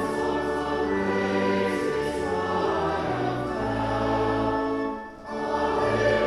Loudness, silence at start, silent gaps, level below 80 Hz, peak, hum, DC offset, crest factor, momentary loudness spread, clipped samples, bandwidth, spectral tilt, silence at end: -26 LUFS; 0 s; none; -46 dBFS; -10 dBFS; none; under 0.1%; 14 dB; 4 LU; under 0.1%; 13 kHz; -6 dB/octave; 0 s